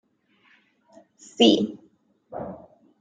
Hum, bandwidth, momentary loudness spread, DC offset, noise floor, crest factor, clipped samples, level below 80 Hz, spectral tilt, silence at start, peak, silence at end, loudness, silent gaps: none; 9.2 kHz; 26 LU; under 0.1%; -63 dBFS; 24 dB; under 0.1%; -68 dBFS; -4.5 dB/octave; 1.4 s; -2 dBFS; 0.45 s; -20 LUFS; none